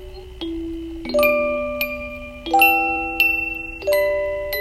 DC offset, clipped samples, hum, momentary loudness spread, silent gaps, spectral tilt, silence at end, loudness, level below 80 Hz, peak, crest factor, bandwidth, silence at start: under 0.1%; under 0.1%; none; 16 LU; none; -3.5 dB/octave; 0 s; -19 LUFS; -40 dBFS; 0 dBFS; 20 dB; 16 kHz; 0 s